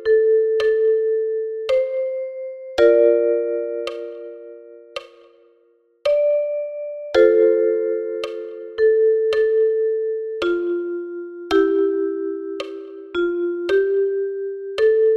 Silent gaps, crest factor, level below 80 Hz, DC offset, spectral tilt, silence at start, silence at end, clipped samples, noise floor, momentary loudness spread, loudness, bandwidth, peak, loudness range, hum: none; 16 dB; -58 dBFS; under 0.1%; -5 dB/octave; 0 s; 0 s; under 0.1%; -59 dBFS; 16 LU; -20 LUFS; 7 kHz; -2 dBFS; 5 LU; none